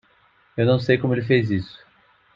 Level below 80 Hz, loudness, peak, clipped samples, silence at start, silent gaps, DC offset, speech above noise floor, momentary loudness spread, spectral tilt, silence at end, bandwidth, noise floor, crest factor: -58 dBFS; -21 LUFS; -4 dBFS; under 0.1%; 0.55 s; none; under 0.1%; 39 dB; 13 LU; -8.5 dB/octave; 0.7 s; 7.4 kHz; -59 dBFS; 20 dB